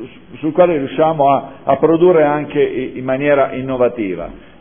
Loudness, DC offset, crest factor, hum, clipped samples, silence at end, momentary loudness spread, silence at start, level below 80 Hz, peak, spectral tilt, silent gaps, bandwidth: -15 LUFS; 0.5%; 14 dB; none; under 0.1%; 0.2 s; 11 LU; 0 s; -46 dBFS; 0 dBFS; -11.5 dB/octave; none; 3.6 kHz